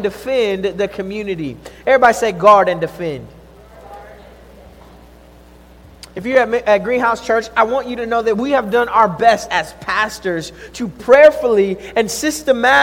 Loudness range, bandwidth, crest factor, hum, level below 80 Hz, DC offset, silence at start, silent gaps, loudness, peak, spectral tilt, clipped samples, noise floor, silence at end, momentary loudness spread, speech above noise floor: 7 LU; 17 kHz; 16 dB; none; -46 dBFS; under 0.1%; 0 s; none; -15 LUFS; 0 dBFS; -4 dB/octave; 0.2%; -42 dBFS; 0 s; 15 LU; 28 dB